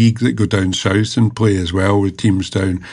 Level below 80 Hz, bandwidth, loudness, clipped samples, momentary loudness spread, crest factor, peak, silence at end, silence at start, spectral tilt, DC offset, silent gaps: -42 dBFS; 11 kHz; -16 LUFS; under 0.1%; 3 LU; 12 dB; -2 dBFS; 0 s; 0 s; -6 dB/octave; under 0.1%; none